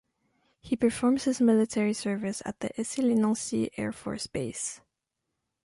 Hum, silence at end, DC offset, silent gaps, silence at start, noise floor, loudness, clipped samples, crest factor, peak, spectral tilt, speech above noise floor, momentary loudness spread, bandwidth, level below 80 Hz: none; 0.85 s; under 0.1%; none; 0.65 s; -84 dBFS; -28 LUFS; under 0.1%; 16 dB; -12 dBFS; -5 dB/octave; 56 dB; 11 LU; 11.5 kHz; -62 dBFS